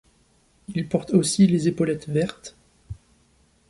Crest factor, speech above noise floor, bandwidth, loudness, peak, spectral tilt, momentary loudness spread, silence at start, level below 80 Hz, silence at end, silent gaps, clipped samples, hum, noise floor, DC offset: 20 dB; 40 dB; 11.5 kHz; -22 LUFS; -6 dBFS; -6 dB/octave; 24 LU; 0.7 s; -54 dBFS; 0.75 s; none; under 0.1%; none; -61 dBFS; under 0.1%